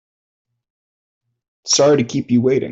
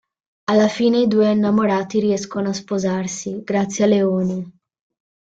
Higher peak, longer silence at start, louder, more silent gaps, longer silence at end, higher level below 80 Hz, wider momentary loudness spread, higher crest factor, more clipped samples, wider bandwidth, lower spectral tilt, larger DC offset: about the same, -4 dBFS vs -4 dBFS; first, 1.65 s vs 0.5 s; first, -15 LUFS vs -19 LUFS; neither; second, 0 s vs 0.8 s; about the same, -60 dBFS vs -60 dBFS; second, 5 LU vs 9 LU; about the same, 16 dB vs 14 dB; neither; about the same, 8.2 kHz vs 8 kHz; second, -4.5 dB/octave vs -6 dB/octave; neither